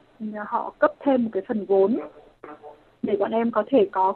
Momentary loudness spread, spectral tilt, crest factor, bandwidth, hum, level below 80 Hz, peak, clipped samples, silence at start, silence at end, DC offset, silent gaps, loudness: 14 LU; -9.5 dB/octave; 18 dB; 4.3 kHz; none; -66 dBFS; -4 dBFS; under 0.1%; 0.2 s; 0 s; under 0.1%; none; -23 LUFS